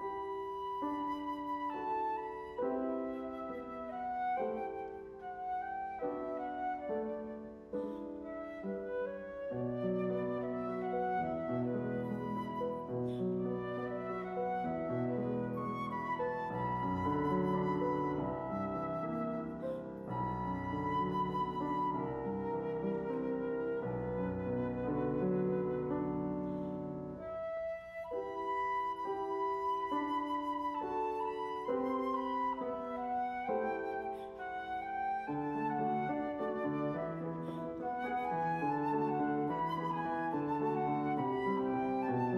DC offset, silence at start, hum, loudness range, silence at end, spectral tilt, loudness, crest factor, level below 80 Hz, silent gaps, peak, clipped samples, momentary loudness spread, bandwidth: under 0.1%; 0 s; 60 Hz at -65 dBFS; 4 LU; 0 s; -9 dB/octave; -37 LUFS; 14 dB; -62 dBFS; none; -22 dBFS; under 0.1%; 7 LU; 12 kHz